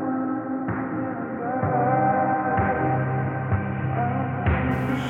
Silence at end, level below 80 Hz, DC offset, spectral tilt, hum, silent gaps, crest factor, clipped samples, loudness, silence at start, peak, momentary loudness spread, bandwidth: 0 s; -40 dBFS; under 0.1%; -9 dB/octave; none; none; 14 dB; under 0.1%; -24 LUFS; 0 s; -10 dBFS; 7 LU; 3.8 kHz